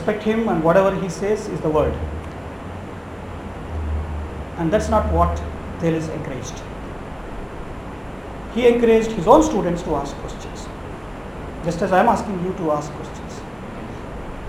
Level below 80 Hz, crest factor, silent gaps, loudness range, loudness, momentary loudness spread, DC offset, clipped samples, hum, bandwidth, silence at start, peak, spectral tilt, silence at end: -34 dBFS; 22 dB; none; 7 LU; -20 LUFS; 17 LU; under 0.1%; under 0.1%; none; 16 kHz; 0 s; 0 dBFS; -6.5 dB/octave; 0 s